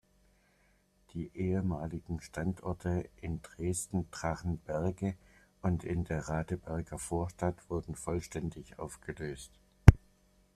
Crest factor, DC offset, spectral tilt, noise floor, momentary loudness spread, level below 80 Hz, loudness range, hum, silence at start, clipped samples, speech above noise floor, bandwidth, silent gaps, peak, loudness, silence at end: 32 dB; under 0.1%; -7 dB/octave; -69 dBFS; 10 LU; -42 dBFS; 7 LU; none; 1.15 s; under 0.1%; 33 dB; 13.5 kHz; none; -2 dBFS; -34 LUFS; 0.6 s